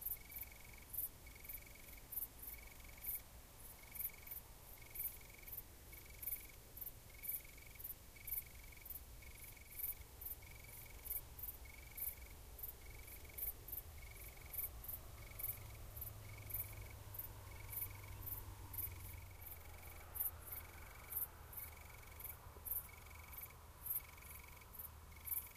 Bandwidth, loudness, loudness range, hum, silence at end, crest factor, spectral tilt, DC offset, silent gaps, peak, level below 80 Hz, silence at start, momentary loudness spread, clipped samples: 15.5 kHz; -49 LUFS; 2 LU; none; 0 s; 24 dB; -3 dB/octave; under 0.1%; none; -28 dBFS; -60 dBFS; 0 s; 11 LU; under 0.1%